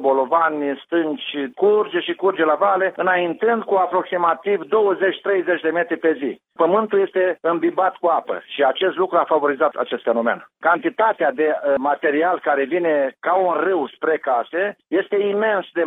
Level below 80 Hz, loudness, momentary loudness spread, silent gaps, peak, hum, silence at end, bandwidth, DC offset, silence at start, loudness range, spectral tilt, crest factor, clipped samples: -72 dBFS; -19 LUFS; 4 LU; none; -4 dBFS; none; 0 s; 3.9 kHz; under 0.1%; 0 s; 1 LU; -8 dB/octave; 16 dB; under 0.1%